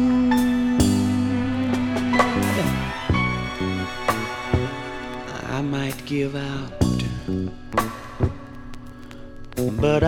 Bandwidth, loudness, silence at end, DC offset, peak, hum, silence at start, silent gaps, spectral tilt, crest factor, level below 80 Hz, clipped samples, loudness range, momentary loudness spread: 18.5 kHz; -23 LUFS; 0 s; under 0.1%; -4 dBFS; none; 0 s; none; -6 dB/octave; 20 dB; -38 dBFS; under 0.1%; 6 LU; 13 LU